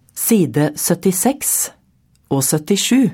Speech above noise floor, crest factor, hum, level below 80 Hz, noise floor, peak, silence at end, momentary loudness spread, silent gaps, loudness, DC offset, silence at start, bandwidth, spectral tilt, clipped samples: 41 dB; 14 dB; none; -56 dBFS; -57 dBFS; -4 dBFS; 0 s; 4 LU; none; -16 LUFS; under 0.1%; 0.15 s; 17 kHz; -4 dB/octave; under 0.1%